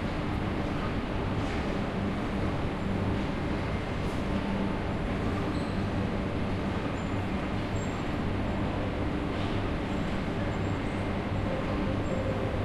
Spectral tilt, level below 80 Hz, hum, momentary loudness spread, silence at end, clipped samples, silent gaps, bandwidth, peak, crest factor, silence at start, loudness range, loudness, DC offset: -7 dB/octave; -38 dBFS; none; 1 LU; 0 s; under 0.1%; none; 12 kHz; -16 dBFS; 14 dB; 0 s; 0 LU; -31 LUFS; under 0.1%